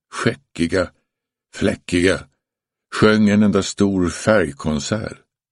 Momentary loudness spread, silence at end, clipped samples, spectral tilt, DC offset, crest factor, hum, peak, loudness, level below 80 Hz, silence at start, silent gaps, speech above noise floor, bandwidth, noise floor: 11 LU; 0.4 s; under 0.1%; -5.5 dB/octave; under 0.1%; 18 dB; none; 0 dBFS; -19 LUFS; -44 dBFS; 0.15 s; none; 67 dB; 11.5 kHz; -85 dBFS